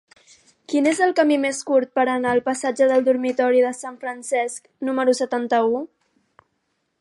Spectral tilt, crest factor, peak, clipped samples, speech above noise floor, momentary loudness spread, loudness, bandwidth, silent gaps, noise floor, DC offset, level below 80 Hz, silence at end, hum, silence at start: -3.5 dB/octave; 16 dB; -6 dBFS; under 0.1%; 52 dB; 10 LU; -21 LUFS; 11.5 kHz; none; -72 dBFS; under 0.1%; -70 dBFS; 1.15 s; none; 0.7 s